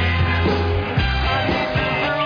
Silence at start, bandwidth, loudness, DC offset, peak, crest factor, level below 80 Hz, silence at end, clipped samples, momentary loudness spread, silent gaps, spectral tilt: 0 s; 5.2 kHz; -19 LUFS; under 0.1%; -8 dBFS; 12 dB; -28 dBFS; 0 s; under 0.1%; 2 LU; none; -7 dB/octave